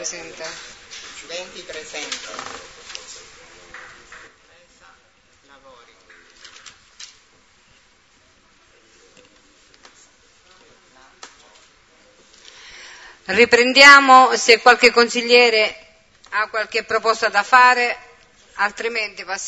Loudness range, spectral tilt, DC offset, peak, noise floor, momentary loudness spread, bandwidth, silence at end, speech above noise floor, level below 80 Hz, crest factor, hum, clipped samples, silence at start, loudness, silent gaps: 22 LU; -1 dB/octave; under 0.1%; 0 dBFS; -56 dBFS; 26 LU; 12 kHz; 0 s; 40 dB; -62 dBFS; 20 dB; none; under 0.1%; 0 s; -14 LUFS; none